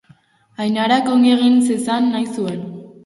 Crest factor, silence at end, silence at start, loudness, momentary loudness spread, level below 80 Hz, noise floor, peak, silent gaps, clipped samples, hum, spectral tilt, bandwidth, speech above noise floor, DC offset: 14 dB; 0.15 s; 0.6 s; -16 LUFS; 12 LU; -64 dBFS; -52 dBFS; -4 dBFS; none; under 0.1%; none; -5 dB/octave; 11.5 kHz; 37 dB; under 0.1%